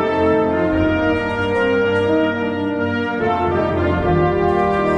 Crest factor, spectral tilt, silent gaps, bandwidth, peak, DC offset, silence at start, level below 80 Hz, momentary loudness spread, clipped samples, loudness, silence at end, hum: 12 dB; -8 dB/octave; none; 9.8 kHz; -6 dBFS; under 0.1%; 0 s; -36 dBFS; 4 LU; under 0.1%; -18 LUFS; 0 s; none